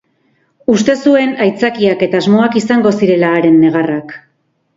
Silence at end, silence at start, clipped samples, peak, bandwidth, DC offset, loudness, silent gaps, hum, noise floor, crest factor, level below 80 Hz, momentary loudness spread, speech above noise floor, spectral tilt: 0.6 s; 0.7 s; under 0.1%; 0 dBFS; 7.8 kHz; under 0.1%; -11 LUFS; none; none; -58 dBFS; 12 dB; -54 dBFS; 7 LU; 47 dB; -6 dB/octave